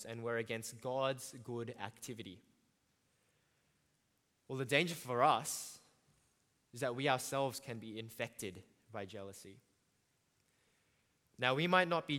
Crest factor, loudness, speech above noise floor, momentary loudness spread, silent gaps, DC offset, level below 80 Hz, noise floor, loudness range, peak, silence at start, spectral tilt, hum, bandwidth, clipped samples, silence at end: 26 dB; -38 LUFS; 41 dB; 18 LU; none; under 0.1%; -82 dBFS; -80 dBFS; 13 LU; -14 dBFS; 0 s; -4 dB/octave; none; 17 kHz; under 0.1%; 0 s